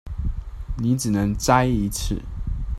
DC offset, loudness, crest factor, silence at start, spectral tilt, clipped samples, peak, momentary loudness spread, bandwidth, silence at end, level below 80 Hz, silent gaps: under 0.1%; -23 LUFS; 20 dB; 0.05 s; -5.5 dB/octave; under 0.1%; -2 dBFS; 13 LU; 14.5 kHz; 0 s; -30 dBFS; none